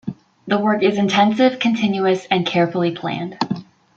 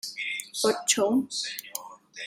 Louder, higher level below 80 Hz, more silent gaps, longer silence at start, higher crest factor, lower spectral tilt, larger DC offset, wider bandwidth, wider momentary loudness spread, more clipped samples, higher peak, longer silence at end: first, -18 LUFS vs -27 LUFS; first, -62 dBFS vs -76 dBFS; neither; about the same, 0.05 s vs 0.05 s; second, 16 dB vs 22 dB; first, -6 dB/octave vs -1.5 dB/octave; neither; second, 7.6 kHz vs 16 kHz; second, 10 LU vs 15 LU; neither; first, -2 dBFS vs -6 dBFS; first, 0.35 s vs 0 s